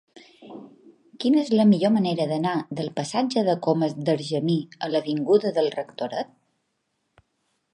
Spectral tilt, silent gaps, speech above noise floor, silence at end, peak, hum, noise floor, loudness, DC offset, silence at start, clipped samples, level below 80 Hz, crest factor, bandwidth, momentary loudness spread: -6.5 dB/octave; none; 52 dB; 1.5 s; -6 dBFS; none; -75 dBFS; -23 LUFS; under 0.1%; 0.15 s; under 0.1%; -72 dBFS; 18 dB; 11.5 kHz; 13 LU